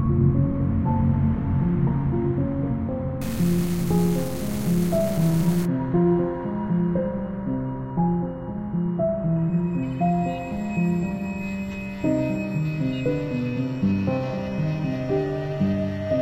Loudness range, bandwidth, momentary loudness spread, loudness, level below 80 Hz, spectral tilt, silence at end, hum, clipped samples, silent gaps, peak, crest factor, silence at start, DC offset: 3 LU; 16.5 kHz; 7 LU; -24 LUFS; -40 dBFS; -8 dB/octave; 0 s; none; under 0.1%; none; -8 dBFS; 16 dB; 0 s; under 0.1%